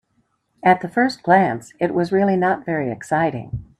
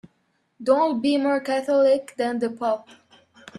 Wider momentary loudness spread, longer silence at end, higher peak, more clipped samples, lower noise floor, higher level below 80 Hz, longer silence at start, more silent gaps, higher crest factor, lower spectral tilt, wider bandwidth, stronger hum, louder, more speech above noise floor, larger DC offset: about the same, 8 LU vs 8 LU; second, 0.15 s vs 0.75 s; first, 0 dBFS vs -6 dBFS; neither; about the same, -67 dBFS vs -69 dBFS; first, -52 dBFS vs -72 dBFS; about the same, 0.65 s vs 0.6 s; neither; about the same, 18 dB vs 18 dB; first, -7 dB/octave vs -5 dB/octave; about the same, 12.5 kHz vs 12 kHz; neither; first, -19 LUFS vs -22 LUFS; about the same, 48 dB vs 47 dB; neither